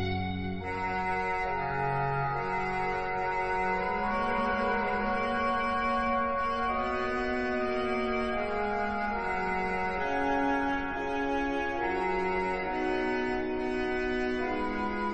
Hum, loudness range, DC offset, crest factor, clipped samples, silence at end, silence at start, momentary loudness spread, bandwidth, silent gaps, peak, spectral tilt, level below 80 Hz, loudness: none; 2 LU; under 0.1%; 12 dB; under 0.1%; 0 s; 0 s; 3 LU; 8.8 kHz; none; -18 dBFS; -6.5 dB/octave; -46 dBFS; -30 LUFS